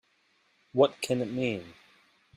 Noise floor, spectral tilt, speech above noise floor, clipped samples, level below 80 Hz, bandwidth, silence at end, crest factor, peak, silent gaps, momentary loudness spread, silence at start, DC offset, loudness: -69 dBFS; -5.5 dB/octave; 41 dB; under 0.1%; -72 dBFS; 14.5 kHz; 0.65 s; 22 dB; -10 dBFS; none; 9 LU; 0.75 s; under 0.1%; -29 LUFS